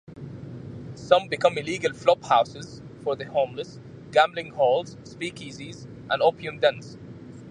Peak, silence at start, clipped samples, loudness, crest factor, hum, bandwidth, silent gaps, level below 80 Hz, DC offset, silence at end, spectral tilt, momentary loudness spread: -2 dBFS; 0.1 s; under 0.1%; -24 LUFS; 24 dB; none; 10 kHz; none; -60 dBFS; under 0.1%; 0 s; -4.5 dB/octave; 19 LU